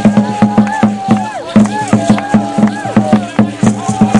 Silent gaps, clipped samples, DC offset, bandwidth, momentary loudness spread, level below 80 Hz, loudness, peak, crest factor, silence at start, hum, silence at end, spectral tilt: none; 0.1%; under 0.1%; 11 kHz; 3 LU; -42 dBFS; -12 LUFS; 0 dBFS; 10 dB; 0 s; none; 0 s; -6.5 dB/octave